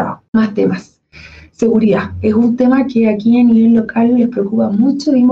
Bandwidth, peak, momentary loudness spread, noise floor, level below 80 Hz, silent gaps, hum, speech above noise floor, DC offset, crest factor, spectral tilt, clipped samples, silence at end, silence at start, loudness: 7.4 kHz; -4 dBFS; 6 LU; -38 dBFS; -48 dBFS; 0.28-0.33 s; none; 27 dB; under 0.1%; 8 dB; -8 dB/octave; under 0.1%; 0 s; 0 s; -12 LUFS